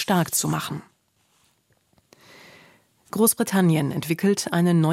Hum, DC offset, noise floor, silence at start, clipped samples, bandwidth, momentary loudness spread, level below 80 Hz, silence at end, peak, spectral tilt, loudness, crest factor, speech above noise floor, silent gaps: none; under 0.1%; -66 dBFS; 0 s; under 0.1%; 16.5 kHz; 11 LU; -64 dBFS; 0 s; -6 dBFS; -5 dB/octave; -22 LUFS; 18 dB; 45 dB; none